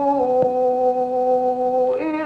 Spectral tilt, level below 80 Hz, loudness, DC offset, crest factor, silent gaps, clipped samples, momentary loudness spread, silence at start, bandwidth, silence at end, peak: -8 dB/octave; -58 dBFS; -19 LUFS; under 0.1%; 12 dB; none; under 0.1%; 2 LU; 0 s; 5.4 kHz; 0 s; -6 dBFS